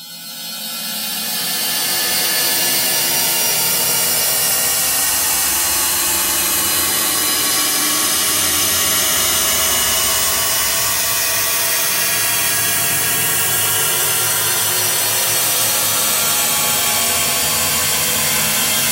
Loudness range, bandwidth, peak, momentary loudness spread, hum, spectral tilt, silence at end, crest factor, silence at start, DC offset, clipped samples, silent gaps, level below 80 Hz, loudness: 1 LU; 16.5 kHz; -2 dBFS; 2 LU; none; 0 dB/octave; 0 s; 14 dB; 0 s; under 0.1%; under 0.1%; none; -46 dBFS; -14 LUFS